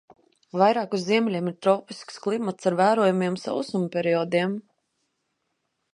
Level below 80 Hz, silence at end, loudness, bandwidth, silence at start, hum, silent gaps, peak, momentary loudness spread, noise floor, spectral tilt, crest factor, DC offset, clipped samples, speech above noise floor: -76 dBFS; 1.35 s; -24 LUFS; 11 kHz; 0.55 s; none; none; -4 dBFS; 8 LU; -77 dBFS; -6 dB/octave; 20 dB; under 0.1%; under 0.1%; 53 dB